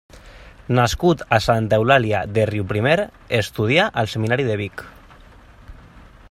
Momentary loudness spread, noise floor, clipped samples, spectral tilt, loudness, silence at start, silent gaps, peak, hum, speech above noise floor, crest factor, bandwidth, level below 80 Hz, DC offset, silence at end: 7 LU; -45 dBFS; under 0.1%; -6 dB/octave; -19 LUFS; 0.15 s; none; -2 dBFS; none; 27 dB; 18 dB; 15 kHz; -42 dBFS; under 0.1%; 0.3 s